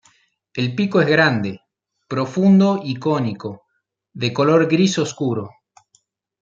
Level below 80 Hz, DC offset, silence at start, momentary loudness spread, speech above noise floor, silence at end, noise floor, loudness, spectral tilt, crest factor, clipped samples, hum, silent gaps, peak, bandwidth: -64 dBFS; under 0.1%; 0.55 s; 15 LU; 55 dB; 0.95 s; -73 dBFS; -18 LUFS; -6 dB/octave; 18 dB; under 0.1%; none; none; 0 dBFS; 7.6 kHz